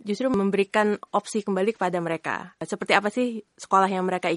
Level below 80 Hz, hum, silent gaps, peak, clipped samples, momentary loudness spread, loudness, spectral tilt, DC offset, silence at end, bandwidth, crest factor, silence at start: -66 dBFS; none; none; -2 dBFS; under 0.1%; 10 LU; -25 LUFS; -5 dB/octave; under 0.1%; 0 s; 11.5 kHz; 22 dB; 0.05 s